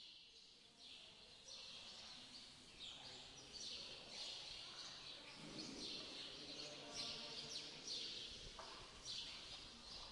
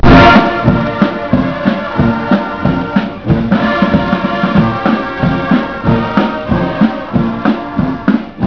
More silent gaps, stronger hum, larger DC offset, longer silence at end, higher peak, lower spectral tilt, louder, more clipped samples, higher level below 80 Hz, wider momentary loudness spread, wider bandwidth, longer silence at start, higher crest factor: neither; neither; neither; about the same, 0 s vs 0 s; second, -36 dBFS vs 0 dBFS; second, -1.5 dB/octave vs -8 dB/octave; second, -52 LUFS vs -12 LUFS; second, under 0.1% vs 0.7%; second, -74 dBFS vs -26 dBFS; first, 11 LU vs 4 LU; first, 12 kHz vs 5.4 kHz; about the same, 0 s vs 0 s; first, 18 dB vs 12 dB